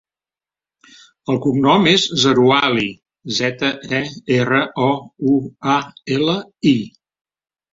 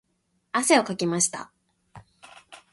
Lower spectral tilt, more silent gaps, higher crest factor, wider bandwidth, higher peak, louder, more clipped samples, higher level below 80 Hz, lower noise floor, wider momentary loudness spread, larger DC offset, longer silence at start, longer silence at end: first, -5 dB/octave vs -3 dB/octave; neither; about the same, 18 dB vs 22 dB; second, 7.8 kHz vs 12 kHz; first, 0 dBFS vs -4 dBFS; first, -17 LUFS vs -23 LUFS; neither; first, -56 dBFS vs -68 dBFS; first, under -90 dBFS vs -72 dBFS; about the same, 10 LU vs 9 LU; neither; first, 1.3 s vs 0.55 s; first, 0.85 s vs 0.15 s